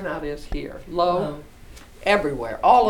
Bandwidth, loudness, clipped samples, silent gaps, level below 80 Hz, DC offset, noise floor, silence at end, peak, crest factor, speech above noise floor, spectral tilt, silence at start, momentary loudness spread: 18 kHz; -24 LUFS; under 0.1%; none; -40 dBFS; under 0.1%; -43 dBFS; 0 s; -2 dBFS; 20 dB; 21 dB; -5.5 dB/octave; 0 s; 12 LU